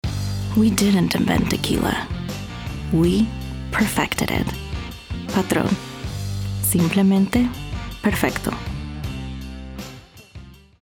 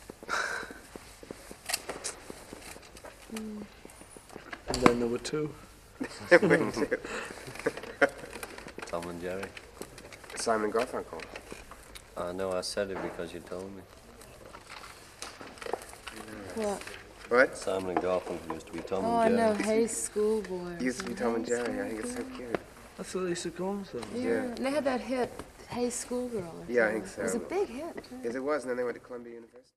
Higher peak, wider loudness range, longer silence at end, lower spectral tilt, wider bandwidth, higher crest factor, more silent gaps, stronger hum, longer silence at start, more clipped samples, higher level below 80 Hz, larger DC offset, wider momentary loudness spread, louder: about the same, -2 dBFS vs -2 dBFS; second, 3 LU vs 11 LU; first, 0.3 s vs 0.15 s; about the same, -5 dB/octave vs -4 dB/octave; first, over 20 kHz vs 15 kHz; second, 20 dB vs 30 dB; neither; neither; about the same, 0.05 s vs 0 s; neither; first, -36 dBFS vs -58 dBFS; neither; second, 15 LU vs 20 LU; first, -22 LUFS vs -32 LUFS